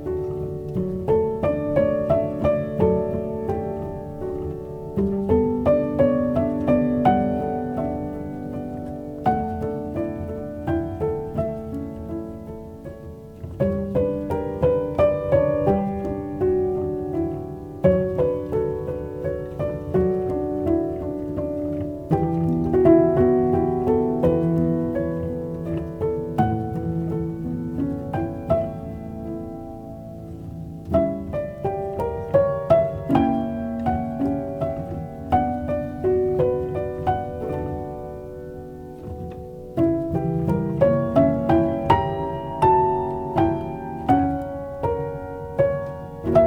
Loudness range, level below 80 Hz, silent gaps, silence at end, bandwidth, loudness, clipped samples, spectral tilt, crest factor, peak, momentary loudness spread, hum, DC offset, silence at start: 8 LU; -42 dBFS; none; 0 s; 15.5 kHz; -23 LUFS; under 0.1%; -10 dB/octave; 20 dB; -2 dBFS; 13 LU; none; under 0.1%; 0 s